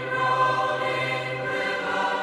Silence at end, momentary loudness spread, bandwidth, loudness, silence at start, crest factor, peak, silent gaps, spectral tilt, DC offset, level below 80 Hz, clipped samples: 0 s; 5 LU; 13 kHz; -24 LUFS; 0 s; 14 dB; -12 dBFS; none; -4.5 dB/octave; under 0.1%; -64 dBFS; under 0.1%